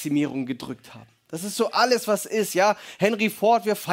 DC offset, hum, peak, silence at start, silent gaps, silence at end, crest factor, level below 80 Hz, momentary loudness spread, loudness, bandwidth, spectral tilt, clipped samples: under 0.1%; none; -6 dBFS; 0 s; none; 0 s; 18 dB; -70 dBFS; 13 LU; -23 LUFS; 16.5 kHz; -4 dB/octave; under 0.1%